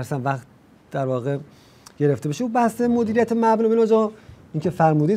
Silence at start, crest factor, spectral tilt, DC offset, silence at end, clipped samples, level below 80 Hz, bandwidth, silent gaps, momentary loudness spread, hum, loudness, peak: 0 s; 16 dB; -7.5 dB/octave; under 0.1%; 0 s; under 0.1%; -60 dBFS; 15 kHz; none; 10 LU; none; -21 LUFS; -4 dBFS